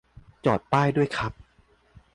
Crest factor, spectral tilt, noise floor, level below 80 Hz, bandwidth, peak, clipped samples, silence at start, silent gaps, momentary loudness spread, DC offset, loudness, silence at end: 18 dB; -7 dB/octave; -61 dBFS; -52 dBFS; 11 kHz; -10 dBFS; under 0.1%; 0.45 s; none; 8 LU; under 0.1%; -25 LUFS; 0.75 s